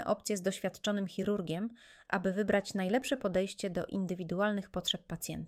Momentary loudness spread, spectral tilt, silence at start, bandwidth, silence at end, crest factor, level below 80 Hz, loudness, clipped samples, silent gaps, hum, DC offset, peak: 5 LU; -4.5 dB/octave; 0 s; 16 kHz; 0 s; 18 dB; -62 dBFS; -34 LUFS; under 0.1%; none; none; under 0.1%; -16 dBFS